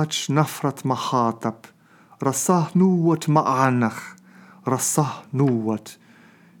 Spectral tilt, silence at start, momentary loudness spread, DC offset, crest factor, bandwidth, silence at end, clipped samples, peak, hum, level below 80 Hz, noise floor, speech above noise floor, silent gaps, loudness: -5.5 dB/octave; 0 s; 12 LU; under 0.1%; 20 dB; 19.5 kHz; 0.65 s; under 0.1%; -2 dBFS; none; -76 dBFS; -51 dBFS; 30 dB; none; -22 LUFS